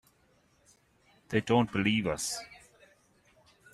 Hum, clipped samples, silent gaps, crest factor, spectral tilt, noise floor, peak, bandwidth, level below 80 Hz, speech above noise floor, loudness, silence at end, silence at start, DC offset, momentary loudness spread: none; under 0.1%; none; 22 dB; -4.5 dB/octave; -68 dBFS; -12 dBFS; 14 kHz; -62 dBFS; 39 dB; -30 LUFS; 1.15 s; 1.3 s; under 0.1%; 11 LU